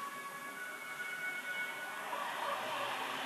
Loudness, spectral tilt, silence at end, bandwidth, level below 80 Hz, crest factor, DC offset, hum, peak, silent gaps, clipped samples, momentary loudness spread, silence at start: -40 LUFS; -1 dB/octave; 0 s; 13 kHz; under -90 dBFS; 16 dB; under 0.1%; none; -26 dBFS; none; under 0.1%; 6 LU; 0 s